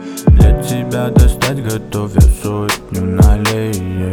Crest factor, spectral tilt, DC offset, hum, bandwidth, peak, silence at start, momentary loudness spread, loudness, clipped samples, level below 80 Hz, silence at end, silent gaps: 12 dB; -6 dB/octave; under 0.1%; none; 19 kHz; 0 dBFS; 0 s; 9 LU; -14 LUFS; under 0.1%; -14 dBFS; 0 s; none